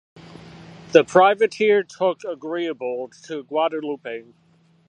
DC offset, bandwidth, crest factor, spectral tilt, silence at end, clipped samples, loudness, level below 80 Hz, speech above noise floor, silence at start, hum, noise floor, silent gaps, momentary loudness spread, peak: under 0.1%; 9.6 kHz; 22 dB; -5 dB/octave; 0.7 s; under 0.1%; -21 LUFS; -68 dBFS; 22 dB; 0.4 s; none; -42 dBFS; none; 16 LU; 0 dBFS